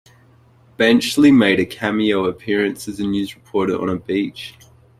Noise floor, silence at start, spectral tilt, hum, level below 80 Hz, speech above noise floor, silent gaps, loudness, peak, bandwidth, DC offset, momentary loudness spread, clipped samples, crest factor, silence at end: -51 dBFS; 0.8 s; -5 dB/octave; none; -54 dBFS; 34 dB; none; -18 LUFS; -2 dBFS; 14.5 kHz; under 0.1%; 12 LU; under 0.1%; 16 dB; 0.5 s